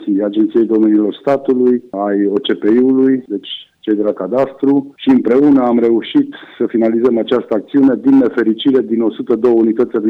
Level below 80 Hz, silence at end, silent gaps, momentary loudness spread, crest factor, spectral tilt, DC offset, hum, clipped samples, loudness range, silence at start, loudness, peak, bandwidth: -56 dBFS; 0 s; none; 7 LU; 10 dB; -8 dB/octave; under 0.1%; none; under 0.1%; 2 LU; 0 s; -13 LUFS; -4 dBFS; 4.6 kHz